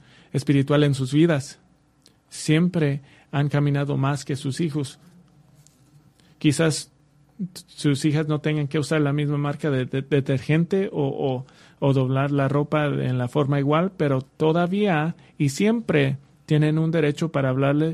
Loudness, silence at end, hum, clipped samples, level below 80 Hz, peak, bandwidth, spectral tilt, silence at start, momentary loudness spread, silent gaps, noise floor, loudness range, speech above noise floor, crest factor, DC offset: -23 LUFS; 0 s; none; under 0.1%; -58 dBFS; -6 dBFS; 12 kHz; -6.5 dB/octave; 0.35 s; 10 LU; none; -59 dBFS; 5 LU; 37 dB; 16 dB; under 0.1%